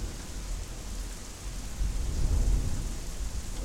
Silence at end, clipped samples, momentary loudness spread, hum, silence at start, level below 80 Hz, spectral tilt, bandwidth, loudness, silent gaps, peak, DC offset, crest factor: 0 s; under 0.1%; 10 LU; none; 0 s; -32 dBFS; -4.5 dB/octave; 15.5 kHz; -35 LUFS; none; -16 dBFS; under 0.1%; 14 dB